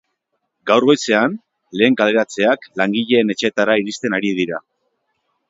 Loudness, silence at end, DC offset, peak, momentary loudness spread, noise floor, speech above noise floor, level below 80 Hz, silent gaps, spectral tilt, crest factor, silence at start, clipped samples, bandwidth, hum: -17 LUFS; 0.9 s; under 0.1%; 0 dBFS; 9 LU; -73 dBFS; 57 dB; -64 dBFS; none; -4.5 dB/octave; 18 dB; 0.65 s; under 0.1%; 8 kHz; none